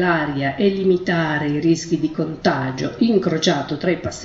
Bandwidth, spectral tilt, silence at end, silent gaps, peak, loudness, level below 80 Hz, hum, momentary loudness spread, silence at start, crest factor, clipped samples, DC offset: 8 kHz; -5.5 dB/octave; 0 s; none; -4 dBFS; -20 LUFS; -50 dBFS; none; 5 LU; 0 s; 16 dB; under 0.1%; under 0.1%